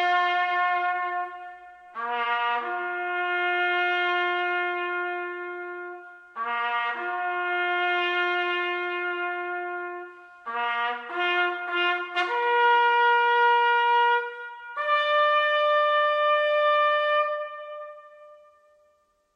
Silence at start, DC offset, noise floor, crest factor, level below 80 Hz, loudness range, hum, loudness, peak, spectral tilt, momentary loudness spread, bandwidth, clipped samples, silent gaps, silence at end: 0 s; under 0.1%; -66 dBFS; 16 dB; -84 dBFS; 6 LU; none; -24 LUFS; -10 dBFS; -1.5 dB/octave; 16 LU; 8.2 kHz; under 0.1%; none; 1 s